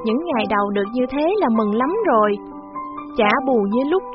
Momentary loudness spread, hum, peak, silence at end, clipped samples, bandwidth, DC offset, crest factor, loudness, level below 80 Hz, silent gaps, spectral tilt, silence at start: 12 LU; none; -2 dBFS; 0 s; under 0.1%; 5.8 kHz; under 0.1%; 18 dB; -19 LUFS; -52 dBFS; none; -4 dB/octave; 0 s